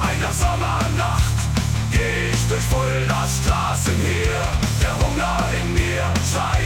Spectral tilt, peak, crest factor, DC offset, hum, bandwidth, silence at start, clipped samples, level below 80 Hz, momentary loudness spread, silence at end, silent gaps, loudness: -4.5 dB/octave; -4 dBFS; 14 dB; under 0.1%; none; 19 kHz; 0 s; under 0.1%; -26 dBFS; 1 LU; 0 s; none; -20 LUFS